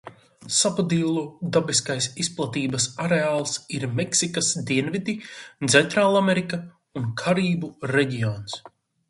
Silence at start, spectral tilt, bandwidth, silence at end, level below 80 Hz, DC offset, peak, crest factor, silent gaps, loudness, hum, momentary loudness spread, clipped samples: 0.05 s; -4 dB/octave; 11.5 kHz; 0.4 s; -62 dBFS; under 0.1%; -2 dBFS; 22 dB; none; -23 LUFS; none; 12 LU; under 0.1%